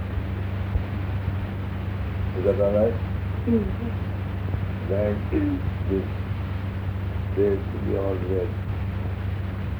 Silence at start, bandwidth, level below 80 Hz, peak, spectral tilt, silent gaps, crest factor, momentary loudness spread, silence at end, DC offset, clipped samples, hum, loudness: 0 s; 5 kHz; -34 dBFS; -10 dBFS; -9.5 dB/octave; none; 16 dB; 6 LU; 0 s; under 0.1%; under 0.1%; none; -27 LUFS